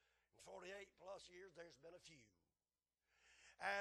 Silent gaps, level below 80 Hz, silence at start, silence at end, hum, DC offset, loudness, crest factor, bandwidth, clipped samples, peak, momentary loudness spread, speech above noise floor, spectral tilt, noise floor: none; -86 dBFS; 0.35 s; 0 s; none; under 0.1%; -56 LUFS; 24 dB; 12 kHz; under 0.1%; -32 dBFS; 16 LU; over 30 dB; -2.5 dB/octave; under -90 dBFS